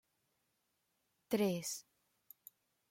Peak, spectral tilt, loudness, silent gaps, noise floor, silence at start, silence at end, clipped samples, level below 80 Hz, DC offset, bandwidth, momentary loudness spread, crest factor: -22 dBFS; -4.5 dB/octave; -39 LUFS; none; -83 dBFS; 1.3 s; 1.1 s; under 0.1%; -84 dBFS; under 0.1%; 16.5 kHz; 23 LU; 22 dB